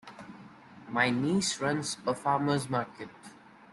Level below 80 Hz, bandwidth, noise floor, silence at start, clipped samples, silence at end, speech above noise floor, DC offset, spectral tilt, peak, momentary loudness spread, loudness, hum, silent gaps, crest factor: -68 dBFS; 12 kHz; -53 dBFS; 0.05 s; under 0.1%; 0.1 s; 23 dB; under 0.1%; -4.5 dB/octave; -10 dBFS; 21 LU; -30 LUFS; none; none; 22 dB